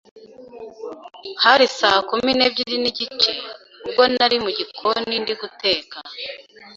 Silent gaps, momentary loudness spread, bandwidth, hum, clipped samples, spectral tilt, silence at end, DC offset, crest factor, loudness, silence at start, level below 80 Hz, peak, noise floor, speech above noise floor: none; 20 LU; 7.8 kHz; none; under 0.1%; -2.5 dB/octave; 0 s; under 0.1%; 20 dB; -18 LUFS; 0.15 s; -60 dBFS; 0 dBFS; -39 dBFS; 19 dB